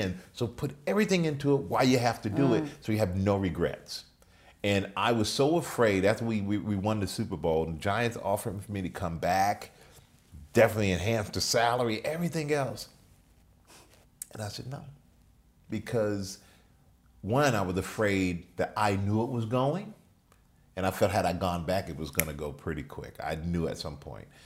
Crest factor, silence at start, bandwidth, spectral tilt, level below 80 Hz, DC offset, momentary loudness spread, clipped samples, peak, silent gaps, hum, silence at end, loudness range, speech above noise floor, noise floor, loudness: 28 dB; 0 s; 16 kHz; -5.5 dB/octave; -56 dBFS; under 0.1%; 14 LU; under 0.1%; -2 dBFS; none; none; 0.2 s; 9 LU; 33 dB; -62 dBFS; -29 LUFS